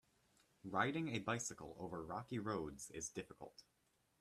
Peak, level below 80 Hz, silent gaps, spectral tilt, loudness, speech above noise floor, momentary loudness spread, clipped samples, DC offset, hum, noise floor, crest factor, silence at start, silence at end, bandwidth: -22 dBFS; -72 dBFS; none; -4.5 dB/octave; -44 LUFS; 31 dB; 18 LU; under 0.1%; under 0.1%; none; -76 dBFS; 24 dB; 0.65 s; 0.6 s; 14 kHz